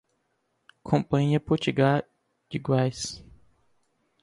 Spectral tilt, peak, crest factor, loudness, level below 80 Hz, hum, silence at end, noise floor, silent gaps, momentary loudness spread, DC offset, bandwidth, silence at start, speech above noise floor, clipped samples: -6.5 dB/octave; -10 dBFS; 18 dB; -26 LUFS; -56 dBFS; none; 1 s; -74 dBFS; none; 13 LU; under 0.1%; 11.5 kHz; 0.85 s; 50 dB; under 0.1%